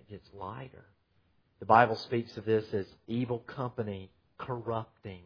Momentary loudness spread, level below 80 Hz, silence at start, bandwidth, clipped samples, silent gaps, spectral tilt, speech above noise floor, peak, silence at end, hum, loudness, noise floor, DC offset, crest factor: 22 LU; -66 dBFS; 0.1 s; 5.4 kHz; under 0.1%; none; -5 dB/octave; 39 dB; -6 dBFS; 0.05 s; none; -31 LUFS; -71 dBFS; under 0.1%; 26 dB